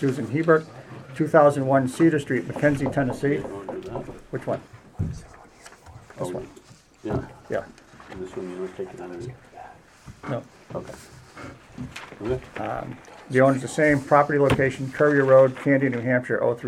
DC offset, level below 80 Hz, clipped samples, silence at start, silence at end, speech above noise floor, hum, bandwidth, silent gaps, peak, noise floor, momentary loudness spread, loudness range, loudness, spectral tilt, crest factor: under 0.1%; -50 dBFS; under 0.1%; 0 s; 0 s; 25 dB; none; 13 kHz; none; -2 dBFS; -48 dBFS; 22 LU; 16 LU; -23 LUFS; -7 dB/octave; 22 dB